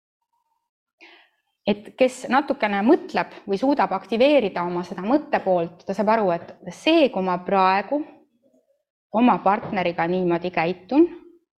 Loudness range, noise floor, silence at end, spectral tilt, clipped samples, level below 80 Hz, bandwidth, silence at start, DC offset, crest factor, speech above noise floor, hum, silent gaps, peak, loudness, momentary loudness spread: 2 LU; -63 dBFS; 0.4 s; -6.5 dB/octave; under 0.1%; -64 dBFS; 11.5 kHz; 1.65 s; under 0.1%; 16 dB; 42 dB; none; 8.90-9.10 s; -6 dBFS; -22 LUFS; 9 LU